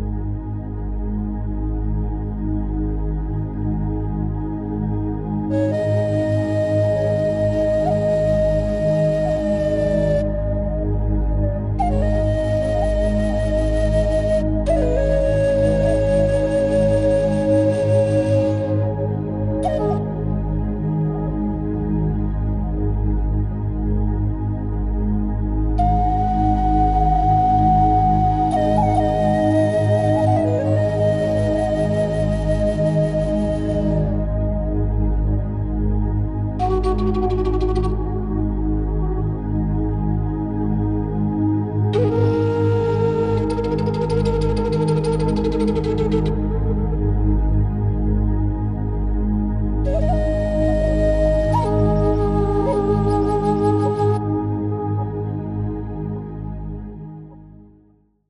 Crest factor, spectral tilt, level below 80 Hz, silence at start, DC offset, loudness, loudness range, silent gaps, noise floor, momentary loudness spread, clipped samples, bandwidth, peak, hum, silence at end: 14 dB; -9 dB/octave; -26 dBFS; 0 s; under 0.1%; -20 LUFS; 5 LU; none; -56 dBFS; 7 LU; under 0.1%; 10.5 kHz; -6 dBFS; 50 Hz at -35 dBFS; 0.8 s